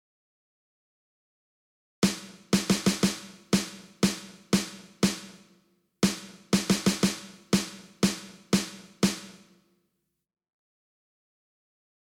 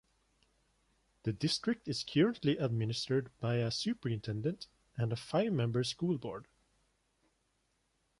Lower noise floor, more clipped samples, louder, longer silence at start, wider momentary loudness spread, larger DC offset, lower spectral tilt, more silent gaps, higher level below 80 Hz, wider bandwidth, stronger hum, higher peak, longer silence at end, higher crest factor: about the same, -79 dBFS vs -78 dBFS; neither; first, -28 LUFS vs -35 LUFS; first, 2 s vs 1.25 s; first, 14 LU vs 9 LU; neither; second, -4 dB/octave vs -6 dB/octave; neither; first, -58 dBFS vs -66 dBFS; first, 17 kHz vs 11.5 kHz; neither; first, -10 dBFS vs -18 dBFS; first, 2.75 s vs 1.75 s; about the same, 20 dB vs 18 dB